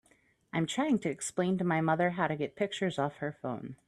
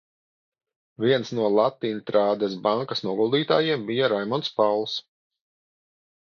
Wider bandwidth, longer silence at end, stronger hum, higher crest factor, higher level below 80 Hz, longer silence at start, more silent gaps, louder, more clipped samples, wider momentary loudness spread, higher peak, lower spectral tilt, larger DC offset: first, 12.5 kHz vs 7 kHz; second, 0.15 s vs 1.2 s; neither; about the same, 18 dB vs 18 dB; about the same, -70 dBFS vs -74 dBFS; second, 0.55 s vs 1 s; neither; second, -32 LUFS vs -24 LUFS; neither; first, 9 LU vs 6 LU; second, -14 dBFS vs -6 dBFS; about the same, -5.5 dB/octave vs -6 dB/octave; neither